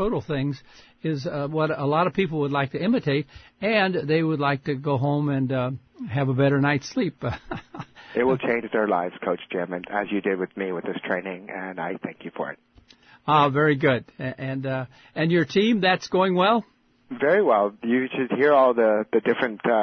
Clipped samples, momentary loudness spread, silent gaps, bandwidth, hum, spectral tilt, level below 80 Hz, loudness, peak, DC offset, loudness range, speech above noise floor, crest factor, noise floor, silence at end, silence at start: under 0.1%; 13 LU; none; 6.6 kHz; none; -7 dB/octave; -56 dBFS; -24 LUFS; -8 dBFS; under 0.1%; 6 LU; 30 dB; 16 dB; -53 dBFS; 0 s; 0 s